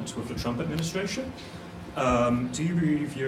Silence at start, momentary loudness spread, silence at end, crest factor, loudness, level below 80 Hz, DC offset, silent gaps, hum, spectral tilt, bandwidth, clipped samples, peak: 0 s; 14 LU; 0 s; 16 dB; -28 LUFS; -48 dBFS; under 0.1%; none; none; -5.5 dB/octave; 15.5 kHz; under 0.1%; -12 dBFS